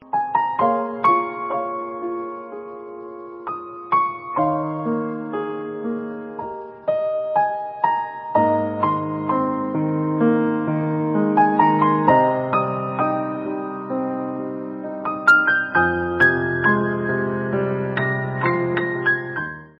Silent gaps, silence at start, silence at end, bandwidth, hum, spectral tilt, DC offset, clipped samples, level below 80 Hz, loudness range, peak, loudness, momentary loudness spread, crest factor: none; 0 s; 0.1 s; 5.8 kHz; none; -5.5 dB/octave; under 0.1%; under 0.1%; -56 dBFS; 7 LU; -2 dBFS; -21 LUFS; 14 LU; 20 dB